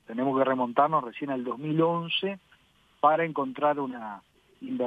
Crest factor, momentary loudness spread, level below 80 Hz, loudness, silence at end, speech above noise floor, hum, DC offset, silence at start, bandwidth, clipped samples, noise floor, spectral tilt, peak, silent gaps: 20 dB; 15 LU; -74 dBFS; -27 LUFS; 0 s; 36 dB; none; under 0.1%; 0.1 s; 5 kHz; under 0.1%; -63 dBFS; -8 dB/octave; -8 dBFS; none